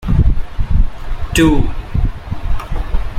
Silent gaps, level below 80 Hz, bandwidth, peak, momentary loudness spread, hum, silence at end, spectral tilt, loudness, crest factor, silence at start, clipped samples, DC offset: none; -16 dBFS; 15.5 kHz; -2 dBFS; 11 LU; none; 0 s; -6 dB/octave; -18 LUFS; 12 dB; 0 s; under 0.1%; under 0.1%